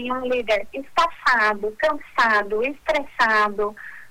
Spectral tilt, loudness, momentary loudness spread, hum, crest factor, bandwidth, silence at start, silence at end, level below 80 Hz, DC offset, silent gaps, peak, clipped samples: -3 dB/octave; -21 LUFS; 7 LU; none; 14 dB; 18 kHz; 0 s; 0 s; -52 dBFS; under 0.1%; none; -8 dBFS; under 0.1%